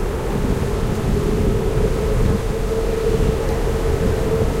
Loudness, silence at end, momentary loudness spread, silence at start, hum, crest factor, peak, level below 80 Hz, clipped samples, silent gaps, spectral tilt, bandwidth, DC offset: -20 LUFS; 0 s; 2 LU; 0 s; none; 14 dB; -4 dBFS; -22 dBFS; under 0.1%; none; -7 dB/octave; 16 kHz; under 0.1%